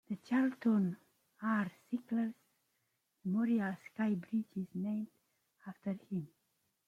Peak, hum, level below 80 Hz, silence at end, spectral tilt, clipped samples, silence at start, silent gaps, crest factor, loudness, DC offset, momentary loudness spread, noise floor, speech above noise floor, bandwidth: -22 dBFS; none; -82 dBFS; 0.6 s; -8.5 dB/octave; under 0.1%; 0.1 s; none; 16 dB; -37 LUFS; under 0.1%; 13 LU; -82 dBFS; 46 dB; 7.2 kHz